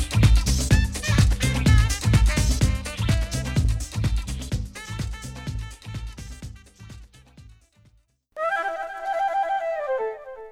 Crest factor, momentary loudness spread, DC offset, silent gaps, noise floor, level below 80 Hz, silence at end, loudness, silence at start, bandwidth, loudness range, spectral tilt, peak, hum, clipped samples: 18 dB; 19 LU; under 0.1%; none; -61 dBFS; -26 dBFS; 0 s; -24 LUFS; 0 s; 16 kHz; 15 LU; -5 dB/octave; -6 dBFS; none; under 0.1%